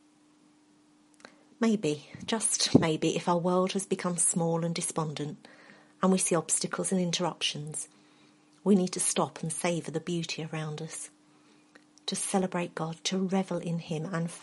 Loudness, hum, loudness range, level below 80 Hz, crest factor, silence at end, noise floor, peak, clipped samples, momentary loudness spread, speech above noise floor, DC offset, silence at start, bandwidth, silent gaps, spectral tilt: -29 LUFS; none; 6 LU; -70 dBFS; 26 dB; 0 s; -62 dBFS; -6 dBFS; under 0.1%; 12 LU; 33 dB; under 0.1%; 1.6 s; 11.5 kHz; none; -4 dB/octave